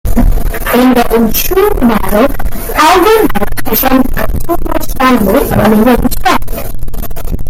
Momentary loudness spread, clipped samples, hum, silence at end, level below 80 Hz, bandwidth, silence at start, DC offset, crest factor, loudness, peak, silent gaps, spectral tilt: 13 LU; under 0.1%; none; 0 s; -16 dBFS; 17 kHz; 0.05 s; under 0.1%; 8 dB; -10 LUFS; 0 dBFS; none; -5 dB/octave